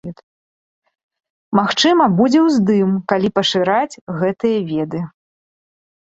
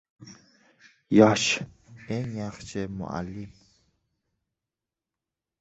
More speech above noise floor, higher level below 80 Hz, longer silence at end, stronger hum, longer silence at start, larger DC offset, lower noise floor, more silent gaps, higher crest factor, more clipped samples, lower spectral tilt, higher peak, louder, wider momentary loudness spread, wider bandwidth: first, over 75 dB vs 64 dB; about the same, -58 dBFS vs -58 dBFS; second, 1.05 s vs 2.1 s; neither; second, 0.05 s vs 0.2 s; neither; about the same, under -90 dBFS vs -89 dBFS; first, 0.23-0.82 s, 1.03-1.09 s, 1.30-1.51 s, 4.01-4.07 s vs none; second, 16 dB vs 26 dB; neither; about the same, -5.5 dB/octave vs -5 dB/octave; about the same, -2 dBFS vs -4 dBFS; first, -16 LUFS vs -25 LUFS; second, 11 LU vs 21 LU; about the same, 8 kHz vs 8.2 kHz